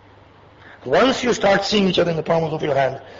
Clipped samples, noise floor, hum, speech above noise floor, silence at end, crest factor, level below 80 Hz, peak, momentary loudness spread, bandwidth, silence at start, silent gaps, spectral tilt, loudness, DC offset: under 0.1%; -48 dBFS; none; 29 dB; 0 s; 14 dB; -50 dBFS; -6 dBFS; 4 LU; 7.8 kHz; 0.65 s; none; -5 dB/octave; -18 LUFS; under 0.1%